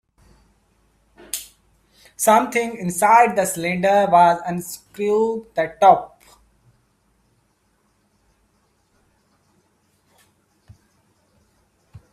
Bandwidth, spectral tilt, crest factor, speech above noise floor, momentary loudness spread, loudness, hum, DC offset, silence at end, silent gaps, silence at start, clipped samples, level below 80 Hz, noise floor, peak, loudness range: 16 kHz; -4 dB/octave; 22 dB; 47 dB; 16 LU; -18 LUFS; none; under 0.1%; 0.15 s; none; 1.35 s; under 0.1%; -62 dBFS; -65 dBFS; 0 dBFS; 6 LU